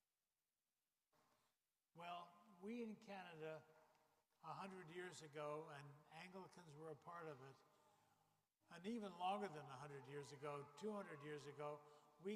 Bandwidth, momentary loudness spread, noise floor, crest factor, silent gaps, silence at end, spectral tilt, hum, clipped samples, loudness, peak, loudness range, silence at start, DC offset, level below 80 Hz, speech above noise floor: 15 kHz; 10 LU; under -90 dBFS; 20 dB; none; 0 s; -5.5 dB/octave; none; under 0.1%; -55 LUFS; -36 dBFS; 6 LU; 1.95 s; under 0.1%; under -90 dBFS; over 35 dB